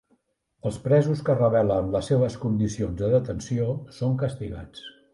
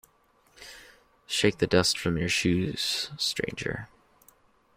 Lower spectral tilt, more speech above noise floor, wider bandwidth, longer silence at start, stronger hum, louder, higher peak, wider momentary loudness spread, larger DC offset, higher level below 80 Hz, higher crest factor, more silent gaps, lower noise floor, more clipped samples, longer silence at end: first, -7.5 dB/octave vs -4 dB/octave; first, 45 dB vs 37 dB; second, 11.5 kHz vs 16.5 kHz; about the same, 0.65 s vs 0.6 s; neither; about the same, -25 LUFS vs -27 LUFS; about the same, -8 dBFS vs -8 dBFS; second, 13 LU vs 22 LU; neither; first, -48 dBFS vs -54 dBFS; second, 16 dB vs 22 dB; neither; first, -69 dBFS vs -65 dBFS; neither; second, 0.25 s vs 0.9 s